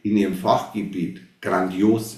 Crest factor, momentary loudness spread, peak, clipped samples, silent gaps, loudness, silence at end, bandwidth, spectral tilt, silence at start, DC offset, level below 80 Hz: 18 dB; 10 LU; -4 dBFS; under 0.1%; none; -23 LUFS; 0 s; 14.5 kHz; -6.5 dB/octave; 0.05 s; under 0.1%; -56 dBFS